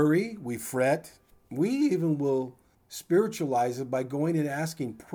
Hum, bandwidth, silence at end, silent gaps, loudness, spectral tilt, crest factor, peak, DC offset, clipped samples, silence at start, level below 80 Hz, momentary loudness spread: none; over 20 kHz; 0 s; none; -28 LUFS; -6.5 dB/octave; 14 dB; -14 dBFS; under 0.1%; under 0.1%; 0 s; -70 dBFS; 10 LU